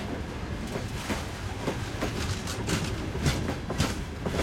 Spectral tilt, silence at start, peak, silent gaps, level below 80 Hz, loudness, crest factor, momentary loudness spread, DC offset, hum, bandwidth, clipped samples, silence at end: -5 dB/octave; 0 s; -12 dBFS; none; -40 dBFS; -32 LUFS; 18 dB; 6 LU; under 0.1%; none; 16.5 kHz; under 0.1%; 0 s